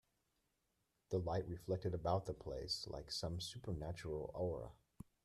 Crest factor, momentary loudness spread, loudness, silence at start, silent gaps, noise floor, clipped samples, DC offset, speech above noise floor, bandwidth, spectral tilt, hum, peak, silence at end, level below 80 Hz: 20 dB; 7 LU; -44 LUFS; 1.1 s; none; -85 dBFS; under 0.1%; under 0.1%; 42 dB; 13.5 kHz; -5.5 dB/octave; none; -26 dBFS; 0.5 s; -62 dBFS